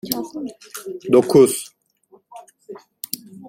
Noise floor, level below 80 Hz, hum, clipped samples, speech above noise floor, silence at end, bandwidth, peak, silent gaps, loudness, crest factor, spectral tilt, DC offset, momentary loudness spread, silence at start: -55 dBFS; -60 dBFS; none; under 0.1%; 37 dB; 0 s; 16.5 kHz; -2 dBFS; none; -18 LUFS; 20 dB; -5 dB/octave; under 0.1%; 26 LU; 0.05 s